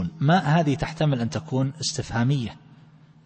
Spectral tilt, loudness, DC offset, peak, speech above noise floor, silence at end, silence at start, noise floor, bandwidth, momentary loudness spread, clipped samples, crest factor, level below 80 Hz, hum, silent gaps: -6 dB/octave; -24 LUFS; under 0.1%; -8 dBFS; 28 dB; 0.7 s; 0 s; -51 dBFS; 8.8 kHz; 7 LU; under 0.1%; 16 dB; -48 dBFS; none; none